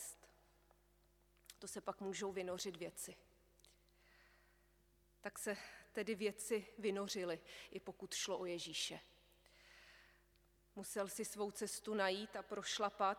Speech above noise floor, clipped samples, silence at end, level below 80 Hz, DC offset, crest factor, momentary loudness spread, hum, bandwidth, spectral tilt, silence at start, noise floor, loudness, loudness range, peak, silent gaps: 30 dB; under 0.1%; 0 s; -76 dBFS; under 0.1%; 24 dB; 18 LU; 50 Hz at -75 dBFS; 19.5 kHz; -2.5 dB/octave; 0 s; -74 dBFS; -45 LUFS; 7 LU; -24 dBFS; none